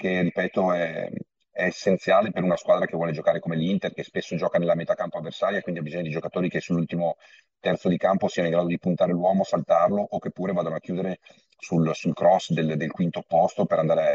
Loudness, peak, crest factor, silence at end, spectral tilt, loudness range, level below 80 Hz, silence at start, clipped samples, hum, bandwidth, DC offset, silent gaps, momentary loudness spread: -25 LUFS; -8 dBFS; 16 dB; 0 s; -7 dB/octave; 3 LU; -64 dBFS; 0 s; under 0.1%; none; 7.8 kHz; under 0.1%; none; 9 LU